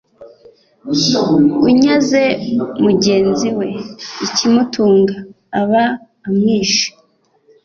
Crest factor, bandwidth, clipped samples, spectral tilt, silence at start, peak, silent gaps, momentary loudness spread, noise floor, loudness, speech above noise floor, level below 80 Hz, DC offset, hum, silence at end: 12 dB; 7.4 kHz; under 0.1%; -4.5 dB/octave; 0.2 s; -2 dBFS; none; 12 LU; -56 dBFS; -14 LUFS; 42 dB; -52 dBFS; under 0.1%; none; 0.75 s